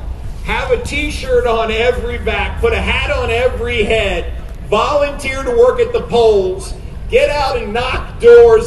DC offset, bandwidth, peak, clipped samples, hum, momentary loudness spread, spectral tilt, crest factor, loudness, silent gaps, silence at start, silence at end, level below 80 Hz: under 0.1%; 12 kHz; 0 dBFS; 0.2%; none; 9 LU; -5 dB/octave; 14 dB; -14 LUFS; none; 0 s; 0 s; -24 dBFS